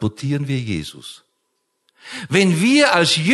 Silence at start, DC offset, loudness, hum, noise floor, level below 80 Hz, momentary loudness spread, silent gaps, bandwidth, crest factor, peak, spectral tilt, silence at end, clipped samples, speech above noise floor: 0 s; under 0.1%; -17 LUFS; none; -71 dBFS; -50 dBFS; 20 LU; none; 12.5 kHz; 18 dB; 0 dBFS; -4.5 dB/octave; 0 s; under 0.1%; 54 dB